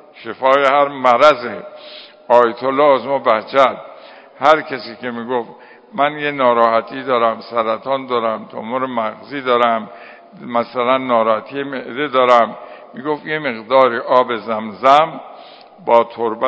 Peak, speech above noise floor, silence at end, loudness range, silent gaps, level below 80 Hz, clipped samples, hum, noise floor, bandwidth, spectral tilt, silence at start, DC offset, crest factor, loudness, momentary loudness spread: 0 dBFS; 23 dB; 0 s; 4 LU; none; -66 dBFS; 0.2%; none; -39 dBFS; 8 kHz; -5.5 dB/octave; 0.15 s; under 0.1%; 16 dB; -16 LUFS; 15 LU